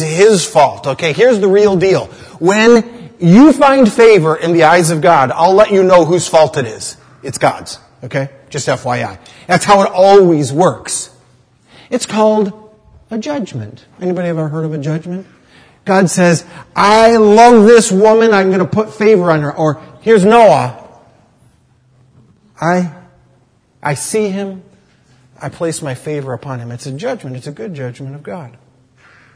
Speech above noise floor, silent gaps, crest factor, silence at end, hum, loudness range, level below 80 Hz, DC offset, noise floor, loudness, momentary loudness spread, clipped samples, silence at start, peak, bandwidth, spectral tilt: 42 dB; none; 12 dB; 0.85 s; none; 14 LU; -50 dBFS; under 0.1%; -52 dBFS; -11 LUFS; 19 LU; 0.7%; 0 s; 0 dBFS; 11 kHz; -5.5 dB/octave